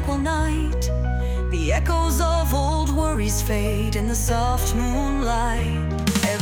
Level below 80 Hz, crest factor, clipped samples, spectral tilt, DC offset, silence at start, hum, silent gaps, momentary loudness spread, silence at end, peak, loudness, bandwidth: -24 dBFS; 14 dB; under 0.1%; -5 dB/octave; under 0.1%; 0 s; none; none; 3 LU; 0 s; -6 dBFS; -22 LUFS; 19 kHz